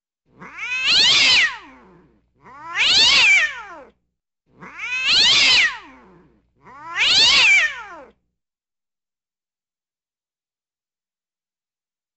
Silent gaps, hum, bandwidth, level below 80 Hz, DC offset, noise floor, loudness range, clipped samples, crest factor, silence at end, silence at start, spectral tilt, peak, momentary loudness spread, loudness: none; none; 13.5 kHz; -56 dBFS; under 0.1%; under -90 dBFS; 3 LU; under 0.1%; 16 dB; 4.15 s; 0.4 s; 1.5 dB/octave; -4 dBFS; 19 LU; -13 LUFS